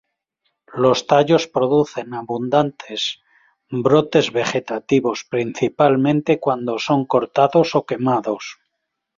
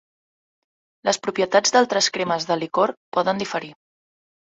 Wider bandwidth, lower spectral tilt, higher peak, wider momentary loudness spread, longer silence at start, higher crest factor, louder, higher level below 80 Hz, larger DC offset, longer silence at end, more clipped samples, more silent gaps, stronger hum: about the same, 7.6 kHz vs 8.2 kHz; first, -5.5 dB/octave vs -2.5 dB/octave; about the same, 0 dBFS vs -2 dBFS; about the same, 10 LU vs 10 LU; second, 0.7 s vs 1.05 s; about the same, 18 dB vs 20 dB; about the same, -19 LUFS vs -21 LUFS; first, -60 dBFS vs -68 dBFS; neither; second, 0.65 s vs 0.8 s; neither; second, none vs 2.97-3.12 s; neither